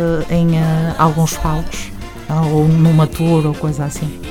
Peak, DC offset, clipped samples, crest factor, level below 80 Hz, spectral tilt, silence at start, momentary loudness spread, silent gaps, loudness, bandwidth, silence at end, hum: 0 dBFS; under 0.1%; under 0.1%; 14 dB; -30 dBFS; -7 dB/octave; 0 s; 13 LU; none; -15 LUFS; 15.5 kHz; 0 s; none